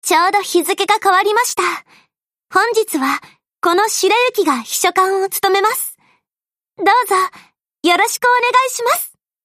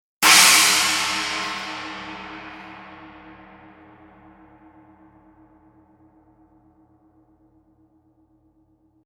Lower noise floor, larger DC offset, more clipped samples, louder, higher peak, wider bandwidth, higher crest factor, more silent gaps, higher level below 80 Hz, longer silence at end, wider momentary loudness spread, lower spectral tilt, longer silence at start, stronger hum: first, under -90 dBFS vs -61 dBFS; neither; neither; about the same, -15 LUFS vs -15 LUFS; about the same, -2 dBFS vs 0 dBFS; about the same, 15.5 kHz vs 16.5 kHz; second, 14 dB vs 24 dB; neither; second, -70 dBFS vs -60 dBFS; second, 0.35 s vs 6 s; second, 7 LU vs 29 LU; first, -0.5 dB/octave vs 1 dB/octave; second, 0.05 s vs 0.2 s; neither